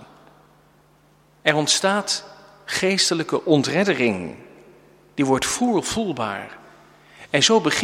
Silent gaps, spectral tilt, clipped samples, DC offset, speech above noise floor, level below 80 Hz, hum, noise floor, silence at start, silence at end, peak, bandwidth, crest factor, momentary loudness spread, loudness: none; -3 dB/octave; under 0.1%; under 0.1%; 36 dB; -58 dBFS; none; -56 dBFS; 0 s; 0 s; -2 dBFS; 16.5 kHz; 22 dB; 12 LU; -20 LUFS